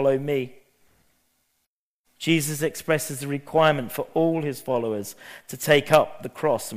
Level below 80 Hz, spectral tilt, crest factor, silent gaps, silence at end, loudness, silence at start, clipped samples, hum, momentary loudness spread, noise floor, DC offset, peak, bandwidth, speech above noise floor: -60 dBFS; -4.5 dB/octave; 24 dB; 1.67-2.04 s; 0 s; -24 LUFS; 0 s; under 0.1%; none; 11 LU; -78 dBFS; under 0.1%; 0 dBFS; 15.5 kHz; 54 dB